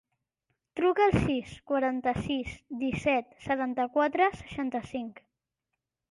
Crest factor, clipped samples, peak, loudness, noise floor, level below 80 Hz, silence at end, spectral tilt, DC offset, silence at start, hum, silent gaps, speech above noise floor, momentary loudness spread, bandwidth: 18 dB; under 0.1%; -12 dBFS; -29 LUFS; -86 dBFS; -52 dBFS; 1 s; -6.5 dB/octave; under 0.1%; 0.75 s; none; none; 57 dB; 12 LU; 11.5 kHz